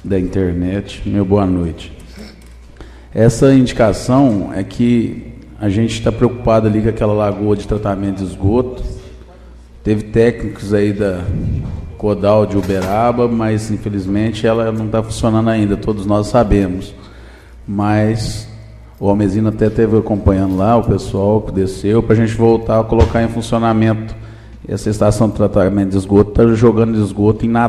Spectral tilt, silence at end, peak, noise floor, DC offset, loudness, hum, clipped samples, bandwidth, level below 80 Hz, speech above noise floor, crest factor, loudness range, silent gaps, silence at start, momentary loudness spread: -7.5 dB/octave; 0 s; 0 dBFS; -38 dBFS; under 0.1%; -15 LUFS; none; under 0.1%; 12.5 kHz; -30 dBFS; 24 dB; 14 dB; 4 LU; none; 0.05 s; 11 LU